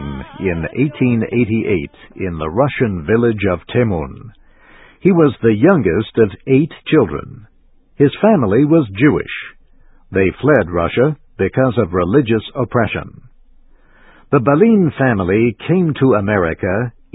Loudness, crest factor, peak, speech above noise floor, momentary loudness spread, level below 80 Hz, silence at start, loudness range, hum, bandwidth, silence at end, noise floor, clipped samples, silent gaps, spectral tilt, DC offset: -15 LUFS; 16 dB; 0 dBFS; 35 dB; 10 LU; -38 dBFS; 0 s; 3 LU; none; 4 kHz; 0.25 s; -49 dBFS; under 0.1%; none; -11.5 dB/octave; under 0.1%